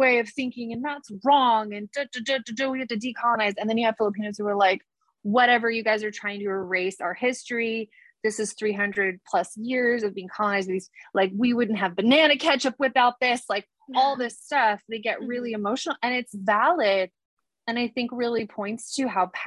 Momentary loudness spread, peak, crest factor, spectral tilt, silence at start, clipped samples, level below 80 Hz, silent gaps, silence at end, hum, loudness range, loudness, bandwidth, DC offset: 11 LU; -6 dBFS; 20 dB; -4 dB/octave; 0 s; under 0.1%; -72 dBFS; 17.25-17.37 s; 0 s; none; 4 LU; -25 LUFS; 12 kHz; under 0.1%